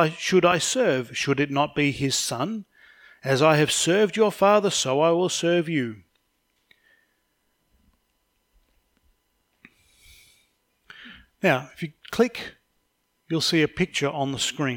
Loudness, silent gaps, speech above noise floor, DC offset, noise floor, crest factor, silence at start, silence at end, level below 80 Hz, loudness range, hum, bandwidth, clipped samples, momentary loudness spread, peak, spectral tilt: -22 LUFS; none; 50 dB; under 0.1%; -72 dBFS; 20 dB; 0 s; 0 s; -60 dBFS; 11 LU; none; 18.5 kHz; under 0.1%; 13 LU; -4 dBFS; -4 dB/octave